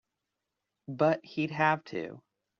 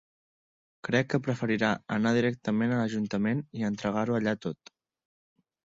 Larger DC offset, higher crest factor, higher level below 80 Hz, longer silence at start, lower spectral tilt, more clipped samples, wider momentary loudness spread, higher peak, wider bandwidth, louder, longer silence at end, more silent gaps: neither; about the same, 22 dB vs 18 dB; second, -76 dBFS vs -64 dBFS; about the same, 0.9 s vs 0.85 s; second, -5 dB/octave vs -6.5 dB/octave; neither; first, 16 LU vs 6 LU; about the same, -12 dBFS vs -12 dBFS; about the same, 7.2 kHz vs 7.8 kHz; about the same, -30 LUFS vs -29 LUFS; second, 0.4 s vs 1.2 s; neither